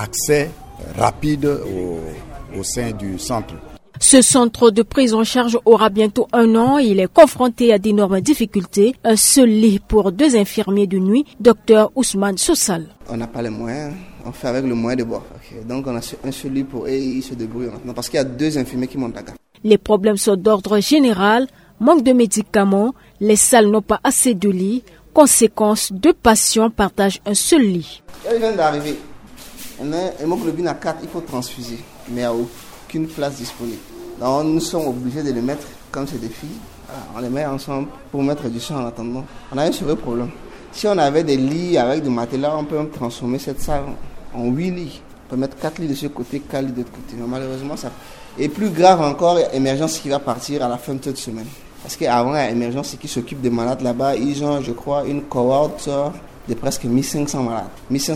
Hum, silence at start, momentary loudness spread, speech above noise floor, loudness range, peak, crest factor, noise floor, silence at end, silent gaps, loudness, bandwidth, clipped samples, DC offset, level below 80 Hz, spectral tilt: none; 0 s; 17 LU; 20 dB; 11 LU; 0 dBFS; 18 dB; -37 dBFS; 0 s; none; -17 LUFS; 17 kHz; under 0.1%; under 0.1%; -42 dBFS; -4.5 dB/octave